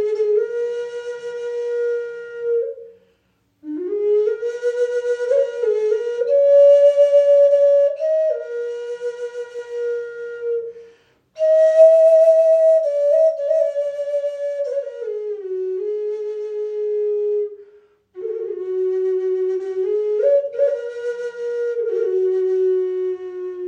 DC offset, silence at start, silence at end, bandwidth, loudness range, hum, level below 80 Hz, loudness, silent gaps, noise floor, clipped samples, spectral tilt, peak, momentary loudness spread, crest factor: under 0.1%; 0 s; 0 s; 8.6 kHz; 10 LU; none; -76 dBFS; -18 LUFS; none; -64 dBFS; under 0.1%; -4.5 dB/octave; -2 dBFS; 15 LU; 16 dB